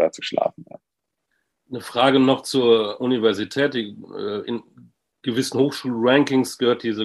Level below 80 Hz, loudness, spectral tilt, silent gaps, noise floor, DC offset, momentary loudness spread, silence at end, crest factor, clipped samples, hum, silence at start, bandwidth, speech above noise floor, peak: -68 dBFS; -21 LUFS; -5 dB/octave; none; -81 dBFS; under 0.1%; 14 LU; 0 s; 18 dB; under 0.1%; none; 0 s; 12.5 kHz; 60 dB; -2 dBFS